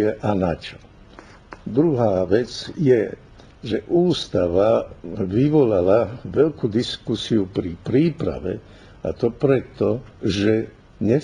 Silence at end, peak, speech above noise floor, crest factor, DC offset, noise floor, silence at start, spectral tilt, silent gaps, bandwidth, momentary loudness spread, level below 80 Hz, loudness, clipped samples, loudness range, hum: 0 s; -4 dBFS; 25 dB; 18 dB; under 0.1%; -45 dBFS; 0 s; -7.5 dB/octave; none; 10.5 kHz; 12 LU; -46 dBFS; -21 LUFS; under 0.1%; 3 LU; none